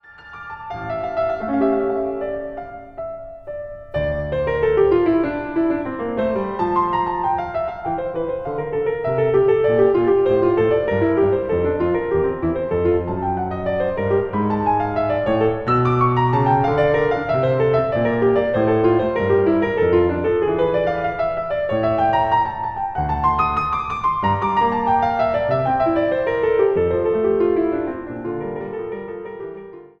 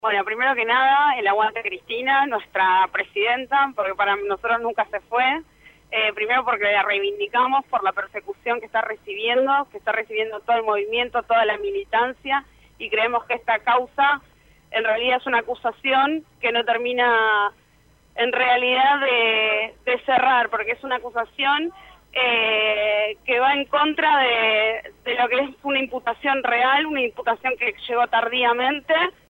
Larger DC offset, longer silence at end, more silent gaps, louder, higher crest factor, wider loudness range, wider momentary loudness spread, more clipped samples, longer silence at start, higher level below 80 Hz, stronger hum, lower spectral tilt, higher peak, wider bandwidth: neither; about the same, 0.15 s vs 0.2 s; neither; about the same, -19 LUFS vs -21 LUFS; about the same, 14 dB vs 14 dB; about the same, 5 LU vs 3 LU; first, 12 LU vs 8 LU; neither; about the same, 0.1 s vs 0.05 s; first, -42 dBFS vs -60 dBFS; neither; first, -9 dB/octave vs -4 dB/octave; about the same, -6 dBFS vs -8 dBFS; second, 6.2 kHz vs 16.5 kHz